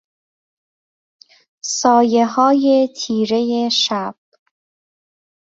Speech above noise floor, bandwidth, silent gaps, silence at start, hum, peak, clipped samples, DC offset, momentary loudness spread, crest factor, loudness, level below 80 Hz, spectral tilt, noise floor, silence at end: over 75 dB; 7.8 kHz; none; 1.65 s; none; -2 dBFS; under 0.1%; under 0.1%; 10 LU; 18 dB; -16 LUFS; -66 dBFS; -3.5 dB/octave; under -90 dBFS; 1.45 s